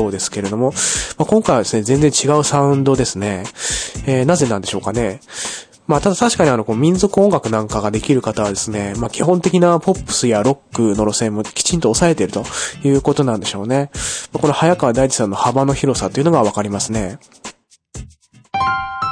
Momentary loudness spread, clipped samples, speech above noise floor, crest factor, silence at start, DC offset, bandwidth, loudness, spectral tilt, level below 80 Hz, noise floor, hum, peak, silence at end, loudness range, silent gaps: 8 LU; under 0.1%; 30 dB; 16 dB; 0 s; under 0.1%; 10.5 kHz; -16 LUFS; -5 dB/octave; -38 dBFS; -45 dBFS; none; 0 dBFS; 0 s; 3 LU; none